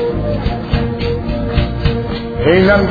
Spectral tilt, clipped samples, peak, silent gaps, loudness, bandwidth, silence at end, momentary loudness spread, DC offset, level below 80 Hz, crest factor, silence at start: -9 dB/octave; under 0.1%; 0 dBFS; none; -16 LUFS; 5 kHz; 0 s; 9 LU; under 0.1%; -22 dBFS; 14 dB; 0 s